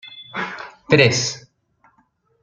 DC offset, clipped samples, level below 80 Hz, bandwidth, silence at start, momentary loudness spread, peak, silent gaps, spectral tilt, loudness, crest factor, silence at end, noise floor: under 0.1%; under 0.1%; -58 dBFS; 9.2 kHz; 0.05 s; 20 LU; -2 dBFS; none; -4 dB/octave; -18 LUFS; 20 dB; 1.05 s; -63 dBFS